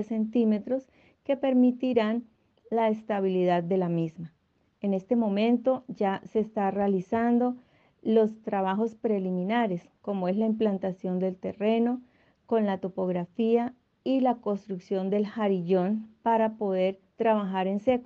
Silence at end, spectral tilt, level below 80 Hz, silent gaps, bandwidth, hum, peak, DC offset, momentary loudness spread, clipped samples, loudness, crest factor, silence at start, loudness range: 0 s; -9 dB/octave; -70 dBFS; none; 6.8 kHz; none; -12 dBFS; under 0.1%; 7 LU; under 0.1%; -28 LUFS; 16 dB; 0 s; 2 LU